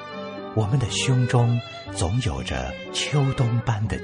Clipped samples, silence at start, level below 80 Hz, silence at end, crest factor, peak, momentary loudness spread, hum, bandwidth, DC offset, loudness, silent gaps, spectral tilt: under 0.1%; 0 s; -40 dBFS; 0 s; 16 dB; -6 dBFS; 9 LU; none; 10.5 kHz; under 0.1%; -24 LUFS; none; -5.5 dB/octave